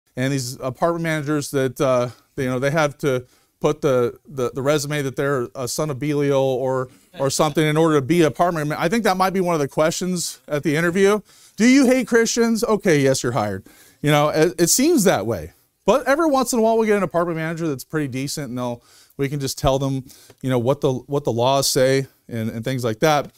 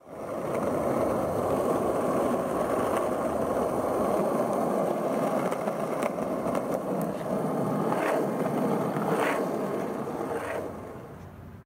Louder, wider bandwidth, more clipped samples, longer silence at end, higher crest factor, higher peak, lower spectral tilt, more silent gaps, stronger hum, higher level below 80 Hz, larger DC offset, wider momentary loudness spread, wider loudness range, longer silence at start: first, -20 LUFS vs -28 LUFS; about the same, 16 kHz vs 16 kHz; neither; about the same, 0.1 s vs 0.05 s; about the same, 18 dB vs 16 dB; first, -2 dBFS vs -12 dBFS; second, -5 dB/octave vs -6.5 dB/octave; neither; neither; first, -48 dBFS vs -58 dBFS; neither; first, 9 LU vs 6 LU; first, 5 LU vs 2 LU; about the same, 0.15 s vs 0.05 s